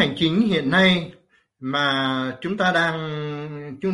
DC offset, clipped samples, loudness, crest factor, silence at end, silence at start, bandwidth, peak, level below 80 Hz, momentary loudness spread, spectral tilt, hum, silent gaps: under 0.1%; under 0.1%; -21 LUFS; 18 dB; 0 s; 0 s; 11 kHz; -4 dBFS; -56 dBFS; 15 LU; -6 dB/octave; none; none